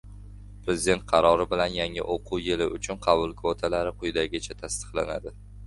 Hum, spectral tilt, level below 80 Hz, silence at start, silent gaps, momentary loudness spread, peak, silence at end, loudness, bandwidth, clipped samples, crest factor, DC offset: 50 Hz at -45 dBFS; -4 dB/octave; -44 dBFS; 0.05 s; none; 12 LU; -6 dBFS; 0 s; -27 LUFS; 11.5 kHz; under 0.1%; 22 dB; under 0.1%